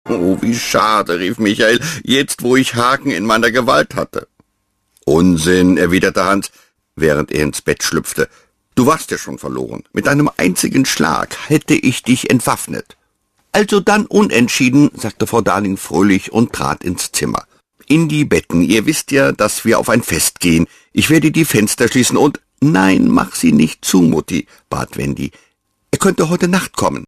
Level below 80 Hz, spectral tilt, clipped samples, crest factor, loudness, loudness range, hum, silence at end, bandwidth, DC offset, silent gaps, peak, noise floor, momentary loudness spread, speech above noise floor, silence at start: -42 dBFS; -4.5 dB/octave; under 0.1%; 14 dB; -14 LUFS; 3 LU; none; 0.05 s; 14.5 kHz; under 0.1%; none; 0 dBFS; -66 dBFS; 10 LU; 53 dB; 0.05 s